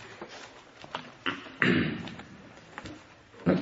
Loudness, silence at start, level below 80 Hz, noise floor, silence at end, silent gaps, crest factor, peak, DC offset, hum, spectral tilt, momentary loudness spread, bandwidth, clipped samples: -31 LUFS; 0 s; -62 dBFS; -51 dBFS; 0 s; none; 28 dB; -4 dBFS; under 0.1%; none; -6 dB/octave; 23 LU; 7.8 kHz; under 0.1%